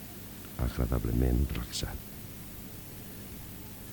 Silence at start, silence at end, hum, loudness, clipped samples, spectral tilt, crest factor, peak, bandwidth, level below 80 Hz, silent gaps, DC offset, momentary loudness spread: 0 s; 0 s; 50 Hz at -50 dBFS; -35 LUFS; under 0.1%; -5.5 dB/octave; 20 dB; -16 dBFS; 19 kHz; -38 dBFS; none; under 0.1%; 13 LU